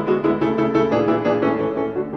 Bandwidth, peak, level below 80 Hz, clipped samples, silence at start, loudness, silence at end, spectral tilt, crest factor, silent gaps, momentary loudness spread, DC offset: 6.4 kHz; -6 dBFS; -50 dBFS; under 0.1%; 0 s; -19 LUFS; 0 s; -8 dB/octave; 14 dB; none; 4 LU; 0.1%